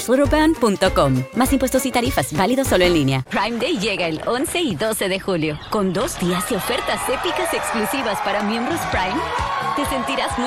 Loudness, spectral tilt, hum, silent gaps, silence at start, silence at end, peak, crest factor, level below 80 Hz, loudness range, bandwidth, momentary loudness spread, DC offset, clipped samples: -20 LUFS; -4.5 dB/octave; none; none; 0 s; 0 s; -2 dBFS; 16 dB; -36 dBFS; 3 LU; 16.5 kHz; 5 LU; under 0.1%; under 0.1%